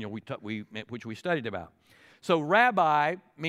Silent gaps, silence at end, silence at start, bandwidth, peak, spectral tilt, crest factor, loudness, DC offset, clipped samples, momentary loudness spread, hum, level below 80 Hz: none; 0 s; 0 s; 14 kHz; -8 dBFS; -6 dB/octave; 20 dB; -27 LUFS; under 0.1%; under 0.1%; 17 LU; none; -74 dBFS